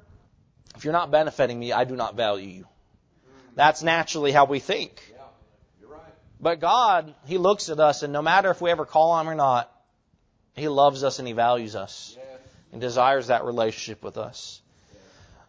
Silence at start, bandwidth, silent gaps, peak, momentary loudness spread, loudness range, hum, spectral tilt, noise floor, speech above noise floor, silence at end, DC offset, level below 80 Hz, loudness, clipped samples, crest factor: 0.8 s; 8 kHz; none; -2 dBFS; 15 LU; 5 LU; none; -4 dB/octave; -66 dBFS; 44 dB; 0.9 s; under 0.1%; -62 dBFS; -23 LUFS; under 0.1%; 22 dB